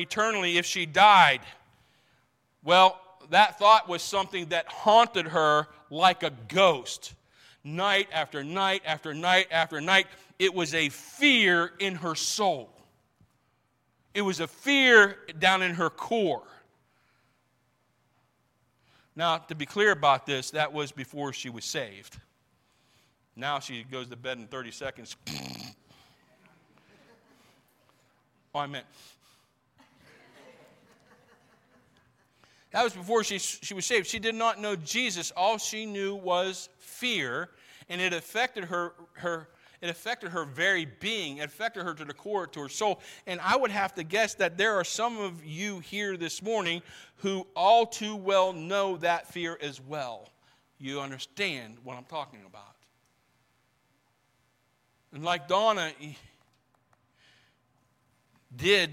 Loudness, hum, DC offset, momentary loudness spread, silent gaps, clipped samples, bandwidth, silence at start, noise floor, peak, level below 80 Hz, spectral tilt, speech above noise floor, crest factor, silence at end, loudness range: -26 LUFS; none; under 0.1%; 17 LU; none; under 0.1%; 16.5 kHz; 0 s; -72 dBFS; -6 dBFS; -72 dBFS; -3 dB/octave; 44 dB; 24 dB; 0 s; 16 LU